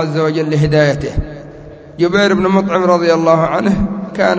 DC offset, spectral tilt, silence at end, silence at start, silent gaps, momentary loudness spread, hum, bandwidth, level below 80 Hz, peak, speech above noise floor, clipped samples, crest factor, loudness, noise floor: under 0.1%; -6.5 dB/octave; 0 s; 0 s; none; 13 LU; none; 8 kHz; -32 dBFS; 0 dBFS; 21 dB; under 0.1%; 14 dB; -13 LUFS; -34 dBFS